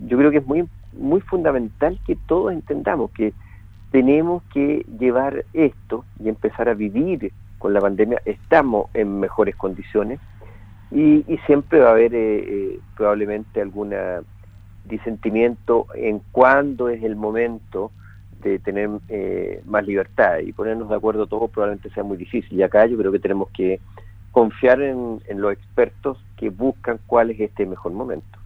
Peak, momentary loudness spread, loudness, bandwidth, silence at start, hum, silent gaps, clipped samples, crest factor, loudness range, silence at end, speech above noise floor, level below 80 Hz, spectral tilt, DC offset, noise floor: 0 dBFS; 13 LU; -20 LUFS; 4.7 kHz; 0 s; none; none; under 0.1%; 20 dB; 5 LU; 0 s; 23 dB; -44 dBFS; -9.5 dB/octave; under 0.1%; -42 dBFS